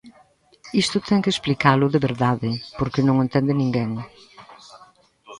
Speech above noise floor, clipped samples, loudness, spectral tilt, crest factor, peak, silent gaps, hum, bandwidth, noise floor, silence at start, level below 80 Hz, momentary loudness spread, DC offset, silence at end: 35 dB; under 0.1%; -21 LUFS; -6 dB/octave; 22 dB; -2 dBFS; none; none; 11.5 kHz; -56 dBFS; 0.05 s; -52 dBFS; 9 LU; under 0.1%; 0.05 s